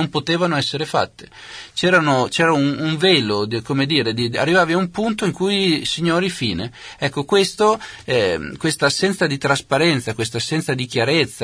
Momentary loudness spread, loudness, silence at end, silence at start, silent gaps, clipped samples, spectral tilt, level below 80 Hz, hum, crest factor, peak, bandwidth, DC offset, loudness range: 8 LU; -18 LUFS; 0 s; 0 s; none; under 0.1%; -4.5 dB/octave; -52 dBFS; none; 16 dB; -2 dBFS; 11 kHz; under 0.1%; 2 LU